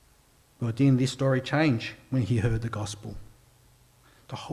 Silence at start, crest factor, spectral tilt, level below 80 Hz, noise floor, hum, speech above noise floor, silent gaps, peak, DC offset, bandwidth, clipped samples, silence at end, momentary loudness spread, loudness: 0.6 s; 16 dB; -6.5 dB/octave; -50 dBFS; -61 dBFS; none; 35 dB; none; -12 dBFS; under 0.1%; 12.5 kHz; under 0.1%; 0 s; 17 LU; -27 LUFS